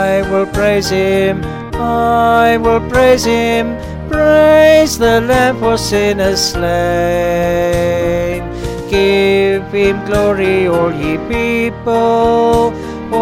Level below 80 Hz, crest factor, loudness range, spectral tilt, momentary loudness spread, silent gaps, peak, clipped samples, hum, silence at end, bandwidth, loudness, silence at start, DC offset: -30 dBFS; 12 dB; 3 LU; -5 dB/octave; 8 LU; none; 0 dBFS; under 0.1%; none; 0 s; 17 kHz; -12 LUFS; 0 s; 0.2%